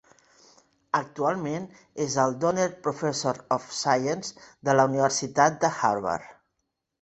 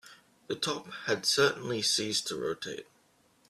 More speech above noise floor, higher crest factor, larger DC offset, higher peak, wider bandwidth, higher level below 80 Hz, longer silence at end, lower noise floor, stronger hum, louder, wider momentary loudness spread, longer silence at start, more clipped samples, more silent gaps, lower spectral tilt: first, 54 dB vs 36 dB; about the same, 22 dB vs 20 dB; neither; first, -4 dBFS vs -12 dBFS; second, 8.4 kHz vs 14.5 kHz; first, -66 dBFS vs -72 dBFS; about the same, 0.7 s vs 0.65 s; first, -80 dBFS vs -67 dBFS; neither; first, -26 LUFS vs -30 LUFS; about the same, 11 LU vs 13 LU; first, 0.95 s vs 0.05 s; neither; neither; first, -4 dB/octave vs -2 dB/octave